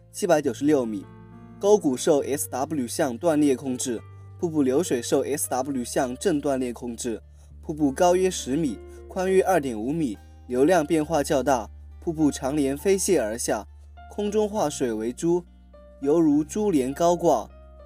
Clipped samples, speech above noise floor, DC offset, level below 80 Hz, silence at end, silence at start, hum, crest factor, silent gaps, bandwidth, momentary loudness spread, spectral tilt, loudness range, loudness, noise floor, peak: under 0.1%; 25 dB; under 0.1%; -50 dBFS; 0 s; 0.15 s; none; 20 dB; none; 16 kHz; 11 LU; -5 dB/octave; 2 LU; -24 LUFS; -48 dBFS; -6 dBFS